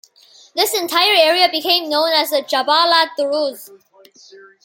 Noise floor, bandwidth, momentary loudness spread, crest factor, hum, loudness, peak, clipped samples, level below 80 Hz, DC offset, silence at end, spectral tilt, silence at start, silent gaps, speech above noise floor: -48 dBFS; 17 kHz; 8 LU; 16 dB; none; -15 LUFS; 0 dBFS; under 0.1%; -74 dBFS; under 0.1%; 0.3 s; 0 dB/octave; 0.55 s; none; 32 dB